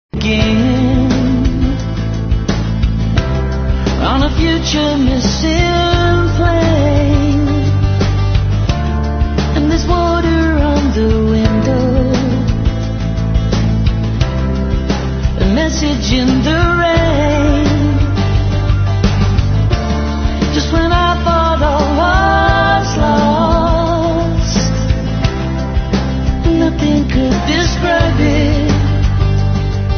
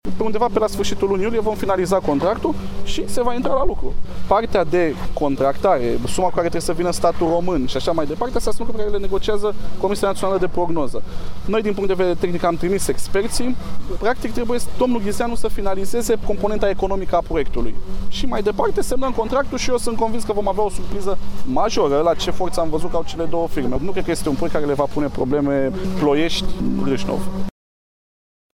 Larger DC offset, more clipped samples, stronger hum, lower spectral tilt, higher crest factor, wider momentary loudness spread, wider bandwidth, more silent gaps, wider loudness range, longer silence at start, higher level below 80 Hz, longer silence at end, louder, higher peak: neither; neither; neither; about the same, -6.5 dB/octave vs -5.5 dB/octave; about the same, 12 dB vs 14 dB; about the same, 5 LU vs 7 LU; second, 6.8 kHz vs 15.5 kHz; neither; about the same, 3 LU vs 2 LU; about the same, 0.15 s vs 0.05 s; first, -18 dBFS vs -30 dBFS; second, 0 s vs 1.05 s; first, -13 LUFS vs -21 LUFS; about the same, 0 dBFS vs -2 dBFS